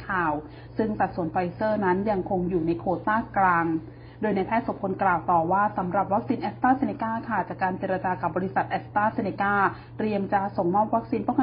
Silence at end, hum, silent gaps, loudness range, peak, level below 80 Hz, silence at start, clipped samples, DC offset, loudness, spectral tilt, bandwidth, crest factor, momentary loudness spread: 0 s; none; none; 2 LU; -10 dBFS; -52 dBFS; 0 s; under 0.1%; under 0.1%; -26 LUFS; -11.5 dB/octave; 5.2 kHz; 16 dB; 6 LU